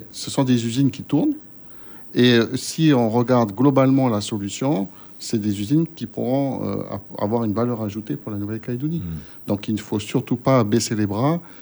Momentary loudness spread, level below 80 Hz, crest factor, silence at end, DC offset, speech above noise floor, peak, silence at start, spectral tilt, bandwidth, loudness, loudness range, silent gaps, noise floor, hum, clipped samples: 12 LU; -56 dBFS; 18 dB; 0 s; under 0.1%; 20 dB; -4 dBFS; 0 s; -6 dB/octave; over 20 kHz; -21 LUFS; 6 LU; none; -40 dBFS; none; under 0.1%